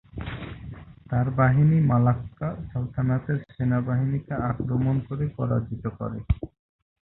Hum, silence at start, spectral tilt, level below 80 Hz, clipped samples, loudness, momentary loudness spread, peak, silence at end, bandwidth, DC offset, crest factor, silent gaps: none; 0.15 s; -13 dB/octave; -42 dBFS; under 0.1%; -25 LUFS; 16 LU; -6 dBFS; 0.55 s; 4 kHz; under 0.1%; 18 dB; none